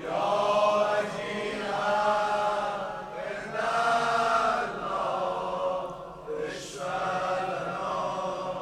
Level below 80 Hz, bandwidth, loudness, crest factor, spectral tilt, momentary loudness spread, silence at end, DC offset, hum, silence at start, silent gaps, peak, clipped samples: -60 dBFS; 13.5 kHz; -28 LUFS; 16 dB; -4 dB/octave; 11 LU; 0 s; under 0.1%; none; 0 s; none; -14 dBFS; under 0.1%